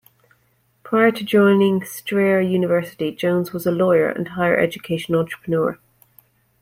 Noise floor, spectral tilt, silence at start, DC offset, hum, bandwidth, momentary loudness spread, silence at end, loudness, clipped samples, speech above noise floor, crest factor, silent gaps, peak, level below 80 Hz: -63 dBFS; -6.5 dB/octave; 0.85 s; under 0.1%; none; 16.5 kHz; 8 LU; 0.85 s; -19 LUFS; under 0.1%; 44 dB; 16 dB; none; -4 dBFS; -60 dBFS